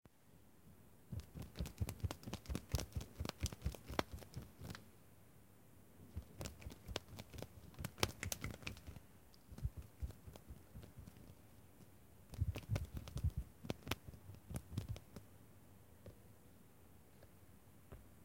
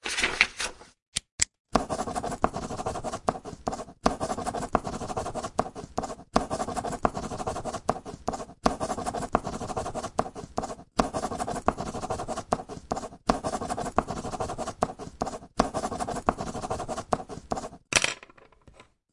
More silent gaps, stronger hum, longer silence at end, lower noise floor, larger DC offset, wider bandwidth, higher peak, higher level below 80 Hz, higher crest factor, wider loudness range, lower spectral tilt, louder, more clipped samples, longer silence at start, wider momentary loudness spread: second, none vs 1.02-1.12 s, 1.32-1.38 s, 1.60-1.65 s; neither; second, 0 s vs 0.3 s; first, -68 dBFS vs -56 dBFS; neither; first, 17 kHz vs 11.5 kHz; second, -12 dBFS vs -2 dBFS; second, -54 dBFS vs -46 dBFS; first, 36 dB vs 30 dB; first, 8 LU vs 2 LU; about the same, -4.5 dB/octave vs -3.5 dB/octave; second, -48 LUFS vs -31 LUFS; neither; about the same, 0 s vs 0.05 s; first, 21 LU vs 8 LU